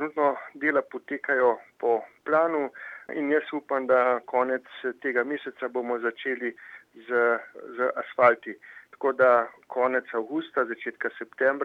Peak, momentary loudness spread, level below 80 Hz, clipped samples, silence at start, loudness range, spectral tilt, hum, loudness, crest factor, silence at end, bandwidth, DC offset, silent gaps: -6 dBFS; 13 LU; -84 dBFS; under 0.1%; 0 s; 4 LU; -6.5 dB/octave; none; -26 LUFS; 20 dB; 0 s; 4.9 kHz; under 0.1%; none